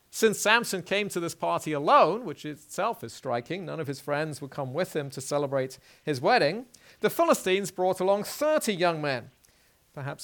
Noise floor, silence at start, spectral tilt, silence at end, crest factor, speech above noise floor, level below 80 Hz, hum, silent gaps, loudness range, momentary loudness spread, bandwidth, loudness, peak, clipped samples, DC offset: -63 dBFS; 0.15 s; -4 dB/octave; 0 s; 22 dB; 36 dB; -72 dBFS; none; none; 6 LU; 14 LU; 19 kHz; -27 LUFS; -6 dBFS; under 0.1%; under 0.1%